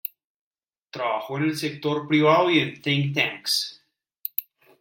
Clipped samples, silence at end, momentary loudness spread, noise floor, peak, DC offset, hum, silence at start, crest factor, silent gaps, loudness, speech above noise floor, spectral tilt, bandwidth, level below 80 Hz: under 0.1%; 0.4 s; 14 LU; under -90 dBFS; -4 dBFS; under 0.1%; none; 0.05 s; 20 dB; 0.25-0.51 s, 0.78-0.82 s; -23 LUFS; over 67 dB; -5 dB/octave; 16.5 kHz; -70 dBFS